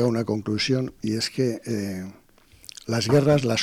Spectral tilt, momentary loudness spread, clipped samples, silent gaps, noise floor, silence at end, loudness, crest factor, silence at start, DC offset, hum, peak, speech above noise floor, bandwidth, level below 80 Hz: -5.5 dB/octave; 19 LU; under 0.1%; none; -48 dBFS; 0 s; -24 LUFS; 18 dB; 0 s; under 0.1%; none; -8 dBFS; 25 dB; 16.5 kHz; -56 dBFS